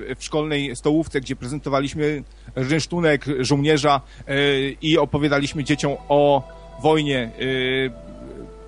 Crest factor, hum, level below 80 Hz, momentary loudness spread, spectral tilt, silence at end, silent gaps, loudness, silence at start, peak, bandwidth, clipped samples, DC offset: 18 dB; none; -42 dBFS; 10 LU; -5.5 dB/octave; 0 s; none; -21 LUFS; 0 s; -4 dBFS; 10.5 kHz; under 0.1%; under 0.1%